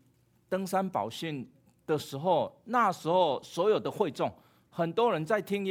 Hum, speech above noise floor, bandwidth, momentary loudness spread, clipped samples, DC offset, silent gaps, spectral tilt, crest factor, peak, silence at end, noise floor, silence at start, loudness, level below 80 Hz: none; 37 dB; 19.5 kHz; 10 LU; under 0.1%; under 0.1%; none; -5.5 dB/octave; 18 dB; -12 dBFS; 0 s; -67 dBFS; 0.5 s; -30 LUFS; -74 dBFS